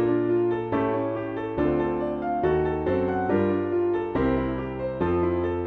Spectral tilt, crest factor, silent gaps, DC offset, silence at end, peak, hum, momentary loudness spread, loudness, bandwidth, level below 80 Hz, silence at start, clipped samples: -10 dB/octave; 12 dB; none; under 0.1%; 0 s; -12 dBFS; none; 5 LU; -25 LUFS; 4.4 kHz; -44 dBFS; 0 s; under 0.1%